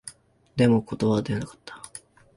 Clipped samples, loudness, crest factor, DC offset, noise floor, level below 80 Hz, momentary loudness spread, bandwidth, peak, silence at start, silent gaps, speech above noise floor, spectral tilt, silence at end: under 0.1%; -24 LUFS; 20 dB; under 0.1%; -48 dBFS; -54 dBFS; 21 LU; 11.5 kHz; -8 dBFS; 0.05 s; none; 25 dB; -6.5 dB/octave; 0.4 s